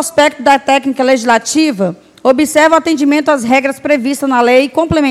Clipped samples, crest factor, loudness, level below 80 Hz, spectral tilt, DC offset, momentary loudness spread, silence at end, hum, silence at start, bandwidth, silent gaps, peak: 0.3%; 10 dB; -11 LUFS; -44 dBFS; -4 dB/octave; under 0.1%; 5 LU; 0 s; none; 0 s; 15 kHz; none; 0 dBFS